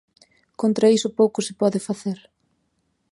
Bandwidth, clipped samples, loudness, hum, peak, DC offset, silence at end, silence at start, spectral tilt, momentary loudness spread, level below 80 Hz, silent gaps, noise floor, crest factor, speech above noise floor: 11.5 kHz; under 0.1%; -21 LUFS; none; -4 dBFS; under 0.1%; 0.95 s; 0.6 s; -5.5 dB/octave; 11 LU; -70 dBFS; none; -70 dBFS; 18 dB; 50 dB